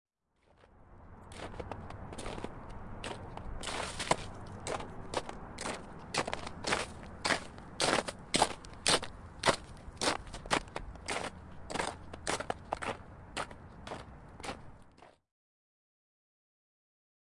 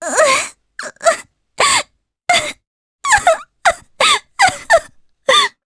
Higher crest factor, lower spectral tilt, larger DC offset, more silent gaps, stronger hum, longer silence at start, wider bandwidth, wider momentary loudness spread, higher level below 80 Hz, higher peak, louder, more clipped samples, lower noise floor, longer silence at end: first, 28 dB vs 16 dB; first, -2.5 dB/octave vs 0 dB/octave; neither; second, none vs 2.67-2.99 s; neither; first, 0.6 s vs 0 s; about the same, 11.5 kHz vs 11 kHz; about the same, 16 LU vs 14 LU; second, -54 dBFS vs -48 dBFS; second, -10 dBFS vs 0 dBFS; second, -37 LUFS vs -14 LUFS; neither; first, -71 dBFS vs -37 dBFS; first, 2.25 s vs 0.15 s